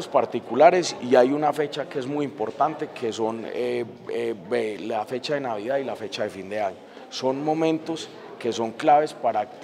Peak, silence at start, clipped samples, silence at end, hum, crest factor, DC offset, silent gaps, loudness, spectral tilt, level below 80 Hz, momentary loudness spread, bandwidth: -2 dBFS; 0 s; under 0.1%; 0 s; none; 22 dB; under 0.1%; none; -25 LUFS; -5 dB/octave; -76 dBFS; 11 LU; 13.5 kHz